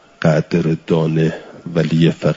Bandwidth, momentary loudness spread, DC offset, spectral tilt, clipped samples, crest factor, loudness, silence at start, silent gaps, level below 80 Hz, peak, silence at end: 7.6 kHz; 6 LU; under 0.1%; -8 dB/octave; under 0.1%; 14 dB; -17 LUFS; 0.2 s; none; -50 dBFS; -2 dBFS; 0 s